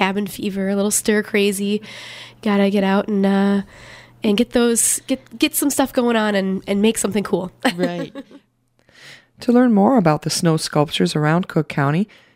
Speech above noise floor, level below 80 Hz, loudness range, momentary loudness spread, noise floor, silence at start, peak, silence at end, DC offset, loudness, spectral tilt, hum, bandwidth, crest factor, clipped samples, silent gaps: 40 dB; -54 dBFS; 3 LU; 10 LU; -59 dBFS; 0 s; -2 dBFS; 0.3 s; under 0.1%; -18 LUFS; -4.5 dB/octave; none; 16 kHz; 16 dB; under 0.1%; none